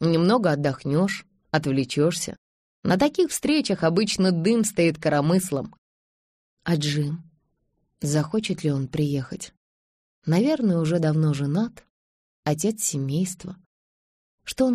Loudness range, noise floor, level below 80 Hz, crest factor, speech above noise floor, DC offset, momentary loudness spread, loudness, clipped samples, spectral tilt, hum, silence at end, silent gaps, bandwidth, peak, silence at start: 6 LU; -72 dBFS; -56 dBFS; 18 dB; 49 dB; under 0.1%; 12 LU; -24 LUFS; under 0.1%; -5.5 dB/octave; none; 0 s; 2.38-2.83 s, 5.78-6.57 s, 9.57-10.22 s, 11.90-12.43 s, 13.66-14.38 s; 15 kHz; -6 dBFS; 0 s